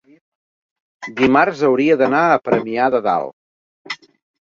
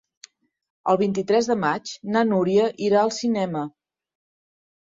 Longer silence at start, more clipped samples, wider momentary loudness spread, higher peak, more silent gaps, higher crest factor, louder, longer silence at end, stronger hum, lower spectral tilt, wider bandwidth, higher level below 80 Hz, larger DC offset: first, 1 s vs 0.85 s; neither; first, 17 LU vs 9 LU; first, 0 dBFS vs -6 dBFS; first, 3.33-3.85 s vs none; about the same, 18 dB vs 18 dB; first, -16 LUFS vs -22 LUFS; second, 0.45 s vs 1.15 s; neither; about the same, -6.5 dB/octave vs -5.5 dB/octave; about the same, 7.6 kHz vs 7.8 kHz; first, -58 dBFS vs -66 dBFS; neither